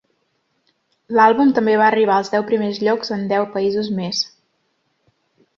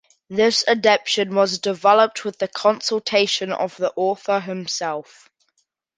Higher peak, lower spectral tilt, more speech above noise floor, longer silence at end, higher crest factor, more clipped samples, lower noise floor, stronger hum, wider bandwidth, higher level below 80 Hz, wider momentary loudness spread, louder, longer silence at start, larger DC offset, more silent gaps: about the same, -2 dBFS vs -2 dBFS; first, -5 dB/octave vs -3 dB/octave; about the same, 51 dB vs 50 dB; first, 1.3 s vs 0.95 s; about the same, 18 dB vs 18 dB; neither; about the same, -68 dBFS vs -70 dBFS; neither; second, 7.4 kHz vs 10 kHz; about the same, -64 dBFS vs -68 dBFS; about the same, 8 LU vs 10 LU; first, -17 LUFS vs -20 LUFS; first, 1.1 s vs 0.3 s; neither; neither